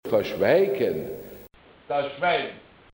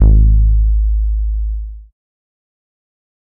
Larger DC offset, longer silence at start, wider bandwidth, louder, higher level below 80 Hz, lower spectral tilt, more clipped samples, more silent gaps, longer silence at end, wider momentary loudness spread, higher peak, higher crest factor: neither; about the same, 0.05 s vs 0 s; first, 17 kHz vs 0.9 kHz; second, -24 LUFS vs -15 LUFS; second, -60 dBFS vs -14 dBFS; second, -6 dB/octave vs -14.5 dB/octave; neither; neither; second, 0.35 s vs 1.45 s; about the same, 16 LU vs 14 LU; second, -6 dBFS vs -2 dBFS; first, 18 dB vs 12 dB